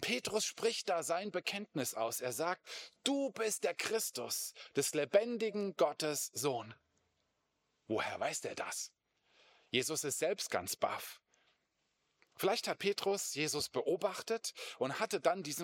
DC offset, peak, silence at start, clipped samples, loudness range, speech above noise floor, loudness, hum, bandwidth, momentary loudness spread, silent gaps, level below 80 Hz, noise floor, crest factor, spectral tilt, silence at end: under 0.1%; -16 dBFS; 0 s; under 0.1%; 4 LU; 45 dB; -37 LUFS; none; 17 kHz; 6 LU; none; -82 dBFS; -82 dBFS; 22 dB; -2.5 dB/octave; 0 s